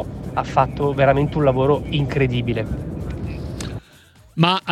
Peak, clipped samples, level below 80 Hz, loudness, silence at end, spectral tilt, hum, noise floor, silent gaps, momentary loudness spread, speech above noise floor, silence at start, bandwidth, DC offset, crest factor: 0 dBFS; under 0.1%; -36 dBFS; -20 LUFS; 0 s; -7 dB/octave; none; -49 dBFS; none; 13 LU; 30 dB; 0 s; 12.5 kHz; under 0.1%; 20 dB